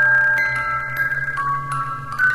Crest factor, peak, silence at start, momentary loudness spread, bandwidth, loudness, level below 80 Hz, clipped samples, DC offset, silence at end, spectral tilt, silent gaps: 12 dB; -8 dBFS; 0 s; 10 LU; 15.5 kHz; -19 LUFS; -48 dBFS; under 0.1%; under 0.1%; 0 s; -4.5 dB/octave; none